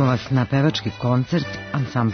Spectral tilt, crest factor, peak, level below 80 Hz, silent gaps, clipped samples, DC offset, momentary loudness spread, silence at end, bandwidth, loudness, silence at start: -7 dB/octave; 14 dB; -6 dBFS; -50 dBFS; none; under 0.1%; under 0.1%; 6 LU; 0 s; 6.6 kHz; -22 LUFS; 0 s